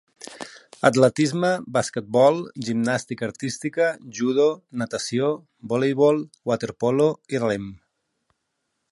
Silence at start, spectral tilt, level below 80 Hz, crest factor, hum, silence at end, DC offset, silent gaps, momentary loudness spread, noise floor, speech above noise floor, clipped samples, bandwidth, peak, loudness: 0.2 s; -5.5 dB/octave; -64 dBFS; 22 dB; none; 1.15 s; under 0.1%; none; 12 LU; -77 dBFS; 55 dB; under 0.1%; 11.5 kHz; -2 dBFS; -23 LUFS